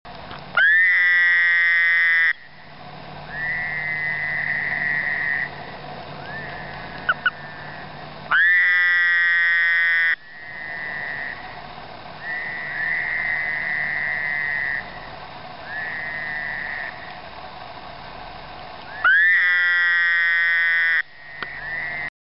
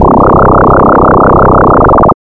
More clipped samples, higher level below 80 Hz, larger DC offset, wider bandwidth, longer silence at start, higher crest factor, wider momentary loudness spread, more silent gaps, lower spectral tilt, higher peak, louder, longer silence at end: neither; second, -54 dBFS vs -16 dBFS; first, 0.5% vs under 0.1%; first, 5.8 kHz vs 4.7 kHz; about the same, 0.05 s vs 0 s; first, 14 dB vs 4 dB; first, 22 LU vs 0 LU; neither; second, -5 dB/octave vs -11.5 dB/octave; second, -8 dBFS vs 0 dBFS; second, -19 LUFS vs -4 LUFS; about the same, 0.15 s vs 0.1 s